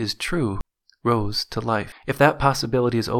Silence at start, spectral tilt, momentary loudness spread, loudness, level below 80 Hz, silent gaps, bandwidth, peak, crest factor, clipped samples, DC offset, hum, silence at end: 0 s; -5.5 dB/octave; 10 LU; -22 LUFS; -40 dBFS; none; 18 kHz; -2 dBFS; 22 dB; under 0.1%; under 0.1%; none; 0 s